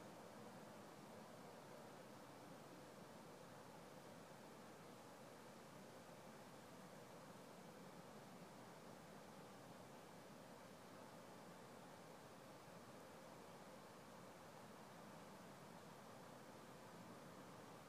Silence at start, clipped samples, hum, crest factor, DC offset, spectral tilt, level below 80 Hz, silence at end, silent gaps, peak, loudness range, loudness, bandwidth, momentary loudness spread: 0 s; under 0.1%; none; 14 dB; under 0.1%; -4.5 dB/octave; -90 dBFS; 0 s; none; -46 dBFS; 0 LU; -60 LUFS; 15.5 kHz; 1 LU